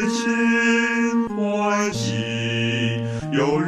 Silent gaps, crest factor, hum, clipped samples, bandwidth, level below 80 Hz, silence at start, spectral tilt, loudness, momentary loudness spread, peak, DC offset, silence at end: none; 14 dB; none; under 0.1%; 11.5 kHz; -54 dBFS; 0 s; -5 dB/octave; -21 LUFS; 6 LU; -8 dBFS; under 0.1%; 0 s